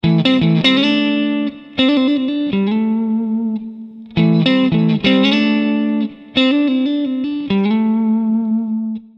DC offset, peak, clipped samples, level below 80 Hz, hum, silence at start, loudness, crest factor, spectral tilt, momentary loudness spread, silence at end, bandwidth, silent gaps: under 0.1%; 0 dBFS; under 0.1%; -50 dBFS; none; 0.05 s; -16 LUFS; 16 dB; -7.5 dB/octave; 8 LU; 0.15 s; 7.2 kHz; none